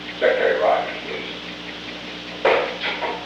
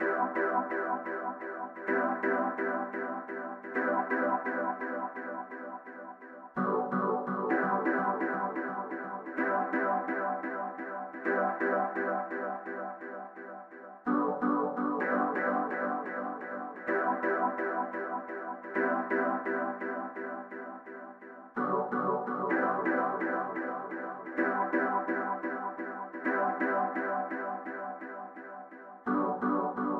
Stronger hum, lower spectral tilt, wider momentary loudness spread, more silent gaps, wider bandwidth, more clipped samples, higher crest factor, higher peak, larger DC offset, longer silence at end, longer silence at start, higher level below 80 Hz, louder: first, 60 Hz at -45 dBFS vs none; second, -4 dB/octave vs -9 dB/octave; about the same, 13 LU vs 12 LU; neither; first, 8.8 kHz vs 5.8 kHz; neither; about the same, 18 dB vs 16 dB; first, -4 dBFS vs -16 dBFS; neither; about the same, 0 s vs 0 s; about the same, 0 s vs 0 s; first, -54 dBFS vs -84 dBFS; first, -22 LUFS vs -33 LUFS